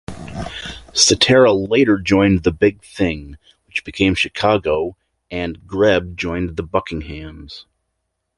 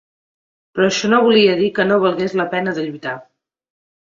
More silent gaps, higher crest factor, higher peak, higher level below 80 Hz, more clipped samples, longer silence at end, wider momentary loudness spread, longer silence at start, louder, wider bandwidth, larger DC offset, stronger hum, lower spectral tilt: neither; about the same, 18 dB vs 16 dB; about the same, 0 dBFS vs -2 dBFS; first, -38 dBFS vs -60 dBFS; neither; second, 0.75 s vs 0.95 s; first, 18 LU vs 15 LU; second, 0.1 s vs 0.75 s; about the same, -17 LUFS vs -16 LUFS; first, 11.5 kHz vs 7.6 kHz; neither; neither; about the same, -4 dB/octave vs -4.5 dB/octave